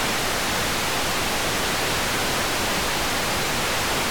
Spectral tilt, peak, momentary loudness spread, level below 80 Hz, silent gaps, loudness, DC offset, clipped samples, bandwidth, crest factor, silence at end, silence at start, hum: -2 dB/octave; -12 dBFS; 0 LU; -40 dBFS; none; -22 LUFS; 1%; under 0.1%; over 20 kHz; 12 dB; 0 s; 0 s; none